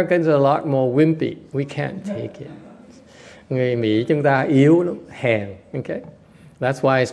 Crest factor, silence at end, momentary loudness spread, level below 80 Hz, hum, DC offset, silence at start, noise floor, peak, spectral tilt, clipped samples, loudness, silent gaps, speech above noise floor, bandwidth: 18 dB; 0 s; 15 LU; -60 dBFS; none; under 0.1%; 0 s; -45 dBFS; -2 dBFS; -7.5 dB/octave; under 0.1%; -20 LUFS; none; 26 dB; 11 kHz